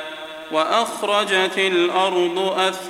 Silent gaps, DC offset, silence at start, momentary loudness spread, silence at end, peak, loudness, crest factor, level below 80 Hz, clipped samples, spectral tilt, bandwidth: none; under 0.1%; 0 s; 6 LU; 0 s; -4 dBFS; -19 LUFS; 16 dB; -68 dBFS; under 0.1%; -3 dB/octave; 15.5 kHz